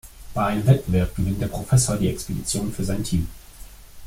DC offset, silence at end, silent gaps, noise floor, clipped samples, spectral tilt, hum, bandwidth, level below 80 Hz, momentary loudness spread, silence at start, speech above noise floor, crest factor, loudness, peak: under 0.1%; 0 s; none; -42 dBFS; under 0.1%; -5.5 dB/octave; none; 16.5 kHz; -36 dBFS; 8 LU; 0.05 s; 20 dB; 18 dB; -23 LUFS; -4 dBFS